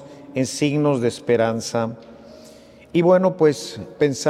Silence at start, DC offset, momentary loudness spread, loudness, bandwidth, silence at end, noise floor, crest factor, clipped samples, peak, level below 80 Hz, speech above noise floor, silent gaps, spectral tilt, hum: 0 s; under 0.1%; 13 LU; -20 LUFS; 14 kHz; 0 s; -45 dBFS; 16 dB; under 0.1%; -4 dBFS; -62 dBFS; 26 dB; none; -5.5 dB/octave; none